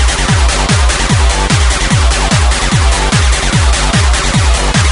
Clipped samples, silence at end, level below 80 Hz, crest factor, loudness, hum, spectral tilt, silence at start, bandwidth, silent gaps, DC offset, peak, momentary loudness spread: under 0.1%; 0 s; -12 dBFS; 10 dB; -10 LUFS; none; -3.5 dB/octave; 0 s; 11 kHz; none; under 0.1%; 0 dBFS; 0 LU